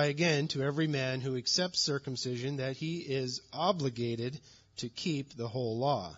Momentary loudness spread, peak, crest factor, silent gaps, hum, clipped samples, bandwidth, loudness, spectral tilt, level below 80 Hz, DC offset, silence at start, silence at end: 9 LU; -16 dBFS; 18 dB; none; none; under 0.1%; 7.4 kHz; -33 LUFS; -4 dB/octave; -70 dBFS; under 0.1%; 0 s; 0 s